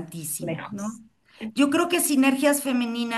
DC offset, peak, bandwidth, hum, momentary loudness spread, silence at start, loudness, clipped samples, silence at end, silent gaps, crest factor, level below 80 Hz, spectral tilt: under 0.1%; -8 dBFS; 13 kHz; none; 14 LU; 0 s; -23 LUFS; under 0.1%; 0 s; none; 16 dB; -68 dBFS; -3.5 dB/octave